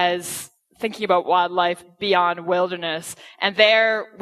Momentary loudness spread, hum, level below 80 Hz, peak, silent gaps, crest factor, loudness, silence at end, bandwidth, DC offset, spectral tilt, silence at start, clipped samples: 15 LU; none; -68 dBFS; 0 dBFS; none; 20 dB; -20 LUFS; 0 s; 14 kHz; under 0.1%; -3 dB/octave; 0 s; under 0.1%